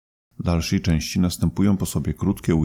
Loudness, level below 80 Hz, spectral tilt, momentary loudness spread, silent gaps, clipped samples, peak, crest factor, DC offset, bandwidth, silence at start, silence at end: -22 LUFS; -36 dBFS; -6 dB/octave; 4 LU; none; under 0.1%; -8 dBFS; 14 dB; under 0.1%; 17 kHz; 0.4 s; 0 s